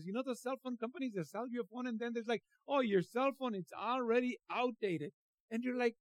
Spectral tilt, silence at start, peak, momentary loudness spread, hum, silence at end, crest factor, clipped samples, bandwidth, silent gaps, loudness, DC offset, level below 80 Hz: -6 dB/octave; 0 s; -20 dBFS; 8 LU; none; 0.1 s; 18 dB; under 0.1%; 14.5 kHz; 5.14-5.48 s; -38 LUFS; under 0.1%; under -90 dBFS